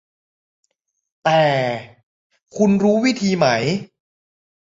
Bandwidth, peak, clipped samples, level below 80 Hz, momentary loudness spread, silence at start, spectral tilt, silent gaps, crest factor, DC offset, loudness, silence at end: 7.8 kHz; -2 dBFS; under 0.1%; -58 dBFS; 10 LU; 1.25 s; -5.5 dB/octave; 2.03-2.30 s; 18 dB; under 0.1%; -18 LUFS; 0.95 s